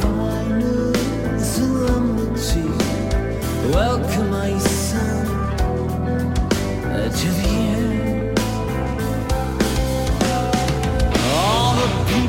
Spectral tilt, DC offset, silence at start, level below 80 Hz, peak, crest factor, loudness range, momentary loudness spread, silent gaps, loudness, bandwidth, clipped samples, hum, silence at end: -5.5 dB/octave; under 0.1%; 0 s; -26 dBFS; -4 dBFS; 14 dB; 1 LU; 4 LU; none; -20 LUFS; 16.5 kHz; under 0.1%; none; 0 s